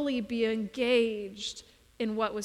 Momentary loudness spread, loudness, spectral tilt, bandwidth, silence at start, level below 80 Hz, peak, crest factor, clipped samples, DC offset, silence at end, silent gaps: 12 LU; -30 LUFS; -4.5 dB/octave; 12.5 kHz; 0 s; -64 dBFS; -16 dBFS; 16 dB; under 0.1%; under 0.1%; 0 s; none